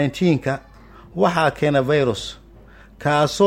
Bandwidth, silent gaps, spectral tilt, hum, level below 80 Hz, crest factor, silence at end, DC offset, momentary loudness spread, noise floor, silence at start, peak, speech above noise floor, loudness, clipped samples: 16 kHz; none; -6 dB/octave; none; -48 dBFS; 16 dB; 0 s; under 0.1%; 12 LU; -45 dBFS; 0 s; -4 dBFS; 27 dB; -20 LUFS; under 0.1%